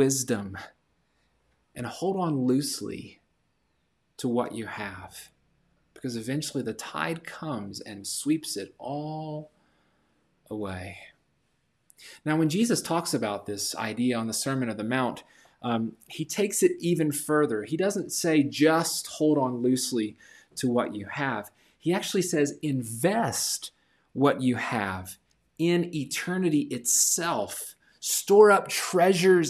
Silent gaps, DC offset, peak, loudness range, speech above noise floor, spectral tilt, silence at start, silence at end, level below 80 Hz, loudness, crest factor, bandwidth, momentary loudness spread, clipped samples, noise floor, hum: none; under 0.1%; -6 dBFS; 9 LU; 47 dB; -4 dB/octave; 0 s; 0 s; -70 dBFS; -27 LUFS; 22 dB; 15.5 kHz; 15 LU; under 0.1%; -73 dBFS; none